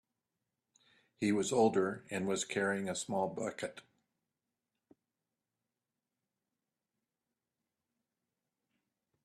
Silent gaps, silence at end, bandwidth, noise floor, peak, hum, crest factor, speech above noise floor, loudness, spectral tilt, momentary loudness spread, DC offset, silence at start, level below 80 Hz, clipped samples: none; 5.45 s; 13.5 kHz; under -90 dBFS; -18 dBFS; none; 22 dB; over 56 dB; -35 LUFS; -4.5 dB/octave; 10 LU; under 0.1%; 1.2 s; -80 dBFS; under 0.1%